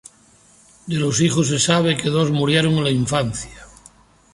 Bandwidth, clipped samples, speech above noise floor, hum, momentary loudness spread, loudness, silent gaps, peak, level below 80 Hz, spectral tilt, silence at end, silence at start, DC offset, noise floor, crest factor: 11.5 kHz; under 0.1%; 34 dB; none; 11 LU; -18 LUFS; none; -2 dBFS; -48 dBFS; -4.5 dB/octave; 0.7 s; 0.85 s; under 0.1%; -52 dBFS; 18 dB